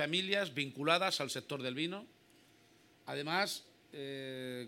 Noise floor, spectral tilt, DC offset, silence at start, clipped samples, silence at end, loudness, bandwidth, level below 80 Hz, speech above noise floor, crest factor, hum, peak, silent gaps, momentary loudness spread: -66 dBFS; -3.5 dB/octave; under 0.1%; 0 s; under 0.1%; 0 s; -36 LUFS; 17 kHz; -86 dBFS; 29 dB; 24 dB; none; -14 dBFS; none; 15 LU